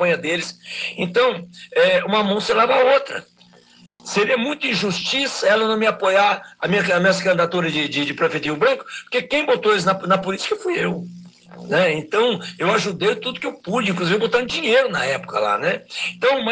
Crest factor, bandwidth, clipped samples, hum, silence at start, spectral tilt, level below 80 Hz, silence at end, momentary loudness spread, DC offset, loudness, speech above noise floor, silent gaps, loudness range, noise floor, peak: 16 dB; 9.8 kHz; under 0.1%; none; 0 s; -4 dB/octave; -62 dBFS; 0 s; 8 LU; under 0.1%; -19 LUFS; 31 dB; none; 3 LU; -51 dBFS; -4 dBFS